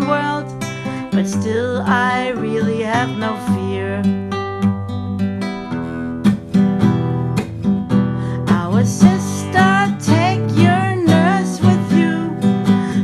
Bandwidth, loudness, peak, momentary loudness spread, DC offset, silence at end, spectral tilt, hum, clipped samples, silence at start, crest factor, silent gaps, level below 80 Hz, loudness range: 12.5 kHz; -17 LUFS; 0 dBFS; 10 LU; under 0.1%; 0 s; -6.5 dB/octave; none; under 0.1%; 0 s; 16 dB; none; -46 dBFS; 5 LU